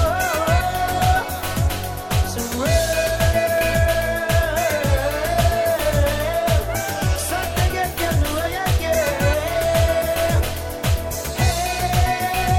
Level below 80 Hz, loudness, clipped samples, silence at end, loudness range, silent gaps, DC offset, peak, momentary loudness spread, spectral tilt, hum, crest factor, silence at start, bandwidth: -26 dBFS; -20 LUFS; under 0.1%; 0 s; 2 LU; none; under 0.1%; -6 dBFS; 4 LU; -4.5 dB/octave; none; 14 dB; 0 s; 17 kHz